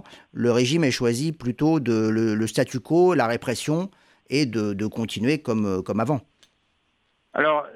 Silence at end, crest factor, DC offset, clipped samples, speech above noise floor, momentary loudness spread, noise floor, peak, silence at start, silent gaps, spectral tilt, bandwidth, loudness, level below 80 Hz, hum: 0.05 s; 16 dB; under 0.1%; under 0.1%; 46 dB; 8 LU; -69 dBFS; -8 dBFS; 0.1 s; none; -5.5 dB/octave; 15 kHz; -23 LUFS; -60 dBFS; none